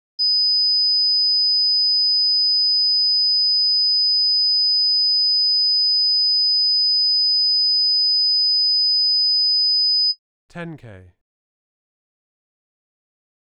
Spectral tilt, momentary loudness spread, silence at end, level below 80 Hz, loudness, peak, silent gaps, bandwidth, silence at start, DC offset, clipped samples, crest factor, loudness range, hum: -3.5 dB/octave; 0 LU; 2.4 s; -72 dBFS; -14 LUFS; -14 dBFS; 10.19-10.49 s; 5.4 kHz; 0.2 s; 0.1%; under 0.1%; 4 dB; 4 LU; 50 Hz at -85 dBFS